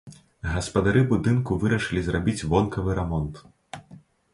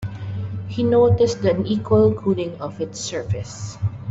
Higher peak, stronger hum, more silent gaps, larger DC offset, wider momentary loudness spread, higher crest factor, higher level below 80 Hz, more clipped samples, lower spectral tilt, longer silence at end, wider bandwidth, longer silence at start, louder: second, -8 dBFS vs -4 dBFS; neither; neither; neither; first, 18 LU vs 12 LU; about the same, 18 dB vs 16 dB; first, -40 dBFS vs -48 dBFS; neither; about the same, -6.5 dB/octave vs -6.5 dB/octave; first, 0.35 s vs 0 s; first, 11.5 kHz vs 8 kHz; about the same, 0.05 s vs 0 s; second, -24 LUFS vs -21 LUFS